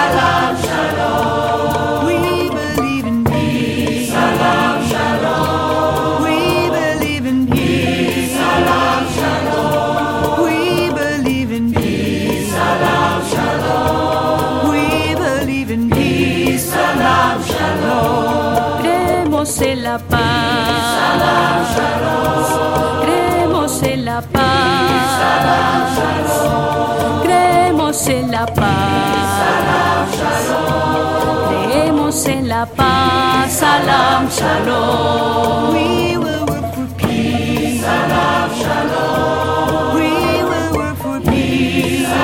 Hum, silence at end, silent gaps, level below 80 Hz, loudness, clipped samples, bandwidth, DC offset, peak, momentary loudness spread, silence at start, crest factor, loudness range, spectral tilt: none; 0 s; none; -40 dBFS; -15 LUFS; under 0.1%; 17 kHz; under 0.1%; 0 dBFS; 4 LU; 0 s; 14 dB; 2 LU; -5 dB/octave